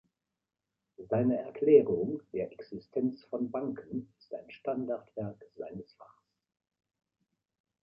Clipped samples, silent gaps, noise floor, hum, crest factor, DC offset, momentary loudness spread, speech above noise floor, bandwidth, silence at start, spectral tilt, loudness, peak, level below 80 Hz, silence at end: under 0.1%; none; -89 dBFS; none; 24 dB; under 0.1%; 21 LU; 57 dB; 5.4 kHz; 1 s; -11 dB/octave; -32 LUFS; -10 dBFS; -70 dBFS; 1.8 s